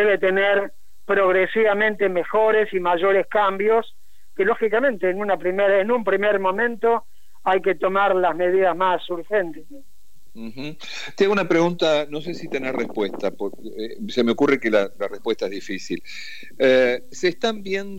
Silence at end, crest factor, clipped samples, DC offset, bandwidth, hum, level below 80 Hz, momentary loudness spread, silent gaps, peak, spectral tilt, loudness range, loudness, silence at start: 0 s; 14 dB; under 0.1%; 2%; 16 kHz; none; -64 dBFS; 14 LU; none; -6 dBFS; -5 dB/octave; 4 LU; -21 LUFS; 0 s